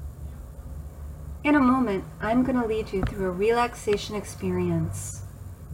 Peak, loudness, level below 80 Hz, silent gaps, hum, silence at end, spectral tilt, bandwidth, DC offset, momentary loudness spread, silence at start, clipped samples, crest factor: -10 dBFS; -25 LUFS; -42 dBFS; none; none; 0 s; -6 dB/octave; 16 kHz; under 0.1%; 19 LU; 0 s; under 0.1%; 16 dB